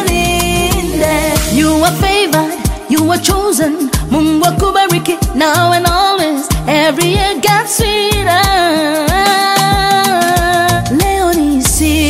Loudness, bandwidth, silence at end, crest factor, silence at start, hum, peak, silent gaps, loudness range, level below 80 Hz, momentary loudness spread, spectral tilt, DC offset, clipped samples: -11 LUFS; 16.5 kHz; 0 s; 12 dB; 0 s; none; 0 dBFS; none; 1 LU; -24 dBFS; 3 LU; -4 dB/octave; under 0.1%; under 0.1%